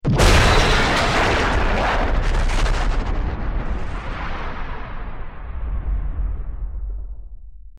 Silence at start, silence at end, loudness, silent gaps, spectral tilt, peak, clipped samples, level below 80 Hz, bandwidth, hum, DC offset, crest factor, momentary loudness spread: 0.05 s; 0.1 s; -21 LUFS; none; -4.5 dB/octave; -6 dBFS; under 0.1%; -22 dBFS; 13.5 kHz; none; under 0.1%; 14 dB; 18 LU